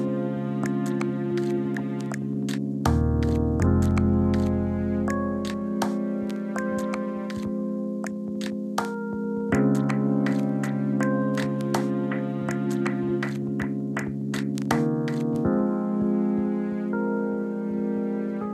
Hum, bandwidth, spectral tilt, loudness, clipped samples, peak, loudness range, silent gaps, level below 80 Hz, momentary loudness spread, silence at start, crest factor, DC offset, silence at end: none; 13.5 kHz; -7.5 dB/octave; -26 LUFS; under 0.1%; -8 dBFS; 4 LU; none; -44 dBFS; 7 LU; 0 s; 18 dB; under 0.1%; 0 s